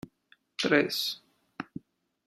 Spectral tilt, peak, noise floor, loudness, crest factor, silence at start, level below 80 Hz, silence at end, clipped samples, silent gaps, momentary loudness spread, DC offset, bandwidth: -3.5 dB/octave; -10 dBFS; -66 dBFS; -28 LUFS; 24 dB; 0.6 s; -72 dBFS; 0.65 s; under 0.1%; none; 21 LU; under 0.1%; 15 kHz